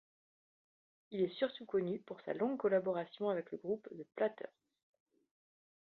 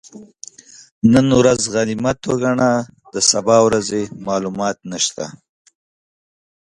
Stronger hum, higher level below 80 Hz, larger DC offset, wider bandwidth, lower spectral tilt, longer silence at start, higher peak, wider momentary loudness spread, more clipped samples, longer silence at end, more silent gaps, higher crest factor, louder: neither; second, -84 dBFS vs -50 dBFS; neither; second, 4.6 kHz vs 11.5 kHz; about the same, -5 dB/octave vs -4 dB/octave; first, 1.1 s vs 0.15 s; second, -22 dBFS vs 0 dBFS; second, 11 LU vs 17 LU; neither; about the same, 1.45 s vs 1.35 s; second, none vs 0.91-1.01 s; about the same, 18 dB vs 18 dB; second, -39 LUFS vs -16 LUFS